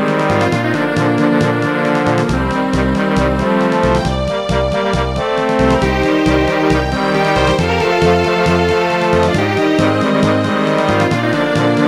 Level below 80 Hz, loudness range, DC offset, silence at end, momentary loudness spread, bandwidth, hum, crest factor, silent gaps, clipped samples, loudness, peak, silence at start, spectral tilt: -28 dBFS; 2 LU; 0.3%; 0 s; 3 LU; 15.5 kHz; none; 12 dB; none; under 0.1%; -14 LUFS; 0 dBFS; 0 s; -6 dB/octave